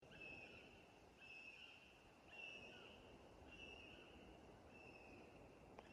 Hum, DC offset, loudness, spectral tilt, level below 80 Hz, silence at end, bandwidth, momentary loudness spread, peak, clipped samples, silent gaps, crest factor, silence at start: none; under 0.1%; -61 LUFS; -4 dB/octave; -76 dBFS; 0 s; 11.5 kHz; 8 LU; -42 dBFS; under 0.1%; none; 20 dB; 0 s